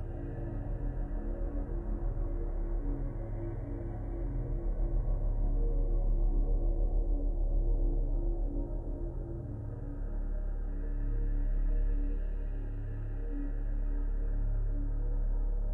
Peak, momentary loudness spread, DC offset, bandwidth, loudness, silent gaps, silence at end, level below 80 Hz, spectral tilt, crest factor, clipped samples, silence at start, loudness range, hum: -22 dBFS; 6 LU; under 0.1%; 2 kHz; -37 LUFS; none; 0 s; -32 dBFS; -11.5 dB/octave; 10 dB; under 0.1%; 0 s; 4 LU; none